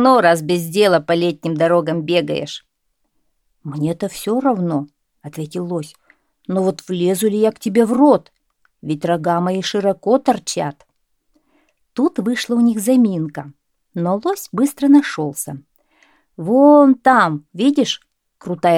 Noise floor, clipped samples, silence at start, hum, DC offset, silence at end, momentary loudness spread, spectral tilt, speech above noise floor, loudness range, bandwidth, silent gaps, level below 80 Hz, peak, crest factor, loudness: -70 dBFS; under 0.1%; 0 s; none; under 0.1%; 0 s; 16 LU; -5.5 dB/octave; 54 dB; 7 LU; 16.5 kHz; none; -62 dBFS; 0 dBFS; 16 dB; -17 LUFS